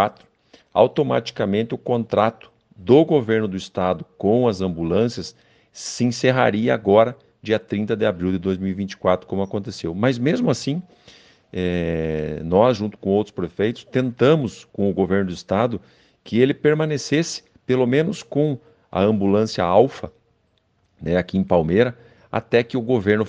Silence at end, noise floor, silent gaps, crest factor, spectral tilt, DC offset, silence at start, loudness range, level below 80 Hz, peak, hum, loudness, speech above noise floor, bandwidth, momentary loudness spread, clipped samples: 0 s; -65 dBFS; none; 20 dB; -6.5 dB/octave; under 0.1%; 0 s; 3 LU; -50 dBFS; 0 dBFS; none; -21 LUFS; 45 dB; 9.6 kHz; 10 LU; under 0.1%